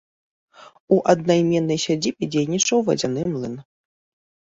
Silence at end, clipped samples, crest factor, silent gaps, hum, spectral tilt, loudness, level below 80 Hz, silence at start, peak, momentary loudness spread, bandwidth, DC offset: 0.95 s; under 0.1%; 20 dB; 0.80-0.88 s; none; -4.5 dB/octave; -20 LUFS; -60 dBFS; 0.65 s; -2 dBFS; 9 LU; 8 kHz; under 0.1%